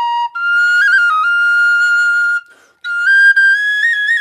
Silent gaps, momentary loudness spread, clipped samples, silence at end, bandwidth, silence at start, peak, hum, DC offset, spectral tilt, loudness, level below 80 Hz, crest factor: none; 9 LU; under 0.1%; 0 s; 13.5 kHz; 0 s; -2 dBFS; none; under 0.1%; 5.5 dB/octave; -11 LUFS; -82 dBFS; 10 dB